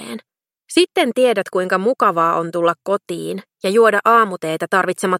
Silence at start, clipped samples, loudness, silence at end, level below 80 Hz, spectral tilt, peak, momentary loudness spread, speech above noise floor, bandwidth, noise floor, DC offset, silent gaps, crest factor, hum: 0 s; under 0.1%; -17 LUFS; 0 s; -72 dBFS; -4.5 dB/octave; 0 dBFS; 12 LU; 44 dB; 16 kHz; -61 dBFS; under 0.1%; none; 16 dB; none